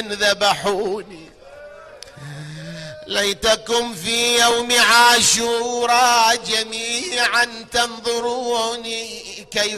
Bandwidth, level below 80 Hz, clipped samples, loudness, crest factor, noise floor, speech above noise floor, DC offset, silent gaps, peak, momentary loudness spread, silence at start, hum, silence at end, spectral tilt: 14 kHz; -50 dBFS; under 0.1%; -17 LUFS; 16 dB; -40 dBFS; 22 dB; under 0.1%; none; -2 dBFS; 20 LU; 0 s; none; 0 s; -1 dB/octave